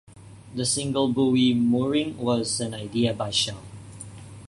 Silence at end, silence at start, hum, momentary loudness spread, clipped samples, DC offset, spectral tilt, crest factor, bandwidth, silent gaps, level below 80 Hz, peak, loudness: 0.05 s; 0.1 s; none; 20 LU; under 0.1%; under 0.1%; -4.5 dB/octave; 16 dB; 11.5 kHz; none; -56 dBFS; -10 dBFS; -24 LUFS